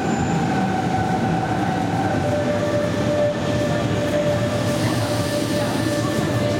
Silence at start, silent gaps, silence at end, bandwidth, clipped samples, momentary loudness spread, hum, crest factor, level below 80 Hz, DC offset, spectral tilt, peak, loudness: 0 s; none; 0 s; 16.5 kHz; under 0.1%; 1 LU; none; 12 dB; -46 dBFS; under 0.1%; -6 dB/octave; -8 dBFS; -21 LUFS